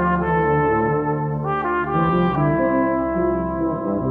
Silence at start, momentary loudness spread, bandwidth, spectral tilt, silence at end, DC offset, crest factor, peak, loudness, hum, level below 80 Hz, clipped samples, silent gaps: 0 s; 5 LU; 4.2 kHz; -10.5 dB/octave; 0 s; under 0.1%; 12 dB; -6 dBFS; -20 LUFS; none; -38 dBFS; under 0.1%; none